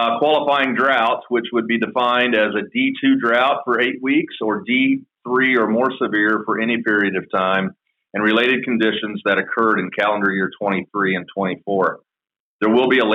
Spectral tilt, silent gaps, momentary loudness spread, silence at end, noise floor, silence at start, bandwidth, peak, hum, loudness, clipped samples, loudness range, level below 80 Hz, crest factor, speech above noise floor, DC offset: -7 dB/octave; 12.40-12.59 s; 6 LU; 0 s; under -90 dBFS; 0 s; 6.4 kHz; -6 dBFS; none; -18 LUFS; under 0.1%; 2 LU; -72 dBFS; 12 dB; over 72 dB; under 0.1%